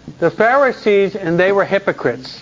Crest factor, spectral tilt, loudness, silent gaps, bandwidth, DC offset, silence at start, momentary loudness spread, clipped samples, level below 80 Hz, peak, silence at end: 14 dB; -6.5 dB/octave; -15 LUFS; none; 7.6 kHz; under 0.1%; 0.05 s; 7 LU; under 0.1%; -54 dBFS; 0 dBFS; 0 s